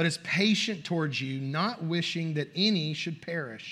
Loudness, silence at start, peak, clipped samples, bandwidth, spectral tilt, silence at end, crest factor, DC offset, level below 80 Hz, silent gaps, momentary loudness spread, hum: -29 LUFS; 0 s; -12 dBFS; under 0.1%; 12.5 kHz; -5 dB/octave; 0 s; 18 dB; under 0.1%; -76 dBFS; none; 9 LU; none